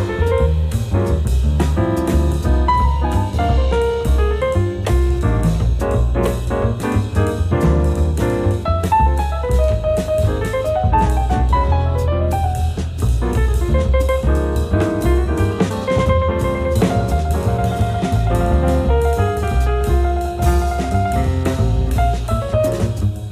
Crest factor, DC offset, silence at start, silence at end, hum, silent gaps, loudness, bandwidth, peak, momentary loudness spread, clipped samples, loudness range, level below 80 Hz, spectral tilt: 12 dB; under 0.1%; 0 s; 0 s; none; none; -18 LUFS; 15 kHz; -4 dBFS; 3 LU; under 0.1%; 1 LU; -20 dBFS; -7.5 dB/octave